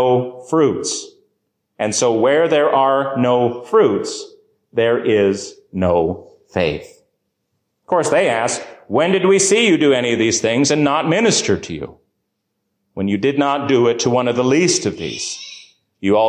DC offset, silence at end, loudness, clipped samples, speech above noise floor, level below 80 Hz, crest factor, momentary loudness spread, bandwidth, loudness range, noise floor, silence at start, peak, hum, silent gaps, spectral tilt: under 0.1%; 0 s; -16 LUFS; under 0.1%; 57 dB; -48 dBFS; 14 dB; 12 LU; 10.5 kHz; 5 LU; -73 dBFS; 0 s; -4 dBFS; none; none; -4 dB/octave